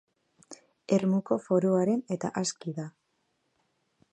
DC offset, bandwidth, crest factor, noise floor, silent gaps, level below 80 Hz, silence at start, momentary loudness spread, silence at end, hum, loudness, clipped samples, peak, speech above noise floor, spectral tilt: under 0.1%; 10.5 kHz; 20 dB; -76 dBFS; none; -74 dBFS; 0.5 s; 13 LU; 1.25 s; none; -28 LUFS; under 0.1%; -12 dBFS; 48 dB; -6 dB/octave